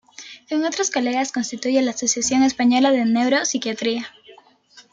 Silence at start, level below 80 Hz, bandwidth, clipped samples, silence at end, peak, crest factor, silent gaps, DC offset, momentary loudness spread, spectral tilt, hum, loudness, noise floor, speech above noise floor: 0.2 s; -62 dBFS; 9.6 kHz; under 0.1%; 0.15 s; -6 dBFS; 16 dB; none; under 0.1%; 9 LU; -2.5 dB/octave; none; -20 LUFS; -51 dBFS; 32 dB